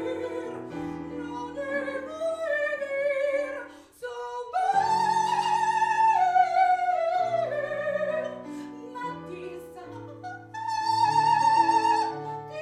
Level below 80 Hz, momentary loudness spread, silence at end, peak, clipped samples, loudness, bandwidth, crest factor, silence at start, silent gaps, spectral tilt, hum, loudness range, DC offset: -66 dBFS; 17 LU; 0 s; -10 dBFS; under 0.1%; -26 LUFS; 13 kHz; 16 dB; 0 s; none; -4 dB/octave; none; 8 LU; under 0.1%